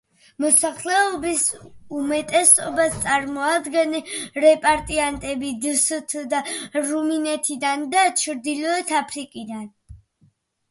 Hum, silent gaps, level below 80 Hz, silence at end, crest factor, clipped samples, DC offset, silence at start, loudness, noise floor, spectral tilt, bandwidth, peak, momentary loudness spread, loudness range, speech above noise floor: none; none; -52 dBFS; 0.75 s; 22 dB; under 0.1%; under 0.1%; 0.4 s; -20 LUFS; -61 dBFS; -1.5 dB/octave; 12 kHz; 0 dBFS; 12 LU; 4 LU; 40 dB